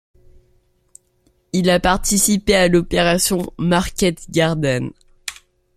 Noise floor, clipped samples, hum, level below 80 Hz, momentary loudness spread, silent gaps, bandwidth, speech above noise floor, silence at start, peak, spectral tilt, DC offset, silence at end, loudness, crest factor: -61 dBFS; under 0.1%; none; -36 dBFS; 16 LU; none; 15 kHz; 44 dB; 1.55 s; 0 dBFS; -4 dB/octave; under 0.1%; 0.45 s; -17 LUFS; 18 dB